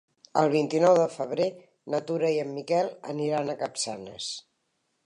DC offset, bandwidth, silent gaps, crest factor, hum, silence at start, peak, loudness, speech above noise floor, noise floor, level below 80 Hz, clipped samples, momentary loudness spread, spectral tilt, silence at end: under 0.1%; 11 kHz; none; 20 dB; none; 0.35 s; -8 dBFS; -27 LUFS; 49 dB; -76 dBFS; -76 dBFS; under 0.1%; 13 LU; -5 dB/octave; 0.65 s